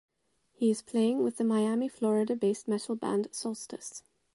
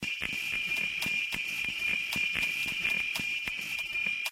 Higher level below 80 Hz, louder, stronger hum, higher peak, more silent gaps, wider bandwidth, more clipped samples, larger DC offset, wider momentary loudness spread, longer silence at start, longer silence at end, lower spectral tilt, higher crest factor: second, -78 dBFS vs -60 dBFS; about the same, -30 LUFS vs -30 LUFS; neither; about the same, -16 dBFS vs -14 dBFS; neither; second, 11.5 kHz vs 17 kHz; neither; neither; first, 12 LU vs 4 LU; first, 0.6 s vs 0 s; first, 0.35 s vs 0 s; first, -5.5 dB/octave vs -1 dB/octave; about the same, 14 dB vs 18 dB